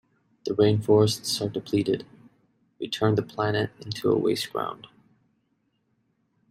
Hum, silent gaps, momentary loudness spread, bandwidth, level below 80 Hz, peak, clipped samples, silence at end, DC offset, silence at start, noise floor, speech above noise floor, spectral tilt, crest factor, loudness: none; none; 12 LU; 16 kHz; -64 dBFS; -8 dBFS; under 0.1%; 1.75 s; under 0.1%; 0.45 s; -72 dBFS; 48 dB; -5.5 dB/octave; 18 dB; -25 LUFS